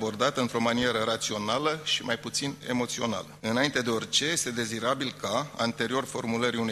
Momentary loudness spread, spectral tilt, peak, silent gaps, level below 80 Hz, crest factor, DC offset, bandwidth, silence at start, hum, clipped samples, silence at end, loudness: 5 LU; -3 dB/octave; -8 dBFS; none; -62 dBFS; 20 dB; under 0.1%; 14.5 kHz; 0 s; none; under 0.1%; 0 s; -28 LUFS